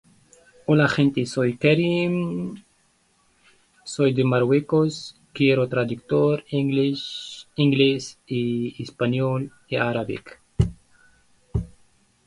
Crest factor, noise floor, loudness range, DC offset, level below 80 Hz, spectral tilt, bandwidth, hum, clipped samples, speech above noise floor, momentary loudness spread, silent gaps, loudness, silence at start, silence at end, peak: 20 dB; -63 dBFS; 4 LU; under 0.1%; -44 dBFS; -6.5 dB/octave; 11.5 kHz; none; under 0.1%; 42 dB; 15 LU; none; -23 LUFS; 0.7 s; 0.6 s; -4 dBFS